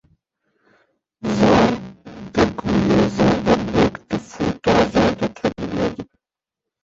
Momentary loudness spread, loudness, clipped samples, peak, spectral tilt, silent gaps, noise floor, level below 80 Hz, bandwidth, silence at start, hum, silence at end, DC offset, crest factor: 12 LU; -19 LUFS; under 0.1%; -2 dBFS; -6.5 dB/octave; none; -85 dBFS; -40 dBFS; 7.8 kHz; 1.25 s; none; 0.8 s; under 0.1%; 18 dB